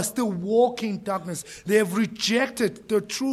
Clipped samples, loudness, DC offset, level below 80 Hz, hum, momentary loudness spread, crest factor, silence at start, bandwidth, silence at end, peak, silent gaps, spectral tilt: under 0.1%; -24 LUFS; under 0.1%; -64 dBFS; none; 8 LU; 16 dB; 0 s; 15 kHz; 0 s; -8 dBFS; none; -4 dB/octave